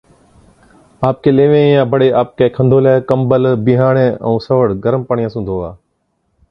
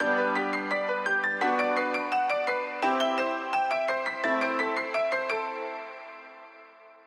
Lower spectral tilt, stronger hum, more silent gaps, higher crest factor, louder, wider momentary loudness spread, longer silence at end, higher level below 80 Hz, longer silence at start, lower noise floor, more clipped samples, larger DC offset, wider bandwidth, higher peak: first, -10 dB/octave vs -3.5 dB/octave; neither; neither; about the same, 14 dB vs 14 dB; first, -13 LUFS vs -27 LUFS; second, 9 LU vs 13 LU; first, 0.75 s vs 0.15 s; first, -44 dBFS vs -84 dBFS; first, 1 s vs 0 s; first, -65 dBFS vs -52 dBFS; neither; neither; second, 5.6 kHz vs 13.5 kHz; first, 0 dBFS vs -14 dBFS